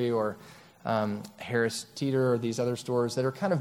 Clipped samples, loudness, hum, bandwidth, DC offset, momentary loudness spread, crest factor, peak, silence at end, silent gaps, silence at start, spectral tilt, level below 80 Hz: under 0.1%; -30 LUFS; none; 16.5 kHz; under 0.1%; 7 LU; 16 dB; -14 dBFS; 0 s; none; 0 s; -6 dB/octave; -70 dBFS